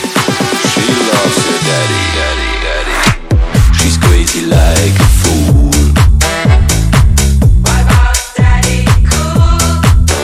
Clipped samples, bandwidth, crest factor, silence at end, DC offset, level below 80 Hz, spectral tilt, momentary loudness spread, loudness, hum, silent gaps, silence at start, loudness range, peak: 0.7%; 16 kHz; 8 dB; 0 s; under 0.1%; -12 dBFS; -4.5 dB/octave; 4 LU; -10 LUFS; none; none; 0 s; 2 LU; 0 dBFS